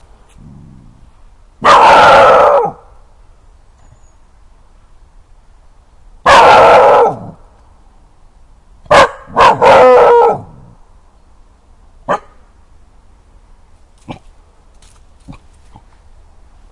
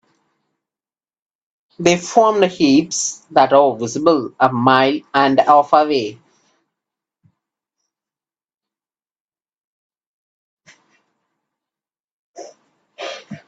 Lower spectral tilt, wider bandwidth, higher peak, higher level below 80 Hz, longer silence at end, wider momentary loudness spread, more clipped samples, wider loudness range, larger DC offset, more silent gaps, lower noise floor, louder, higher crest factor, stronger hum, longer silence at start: about the same, -3.5 dB/octave vs -4 dB/octave; first, 12 kHz vs 9.2 kHz; about the same, 0 dBFS vs 0 dBFS; first, -40 dBFS vs -64 dBFS; first, 1.4 s vs 0.1 s; first, 16 LU vs 10 LU; first, 1% vs under 0.1%; first, 19 LU vs 6 LU; neither; second, none vs 8.54-8.58 s, 9.20-9.26 s, 9.58-9.90 s, 10.06-10.57 s, 12.00-12.34 s; second, -43 dBFS vs under -90 dBFS; first, -7 LUFS vs -15 LUFS; second, 12 dB vs 20 dB; neither; second, 1.6 s vs 1.8 s